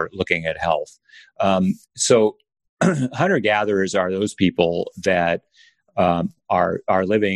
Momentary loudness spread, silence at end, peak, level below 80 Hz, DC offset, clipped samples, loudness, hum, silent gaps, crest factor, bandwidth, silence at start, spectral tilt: 6 LU; 0 s; -2 dBFS; -54 dBFS; under 0.1%; under 0.1%; -20 LUFS; none; 2.69-2.77 s; 20 dB; 12 kHz; 0 s; -5 dB/octave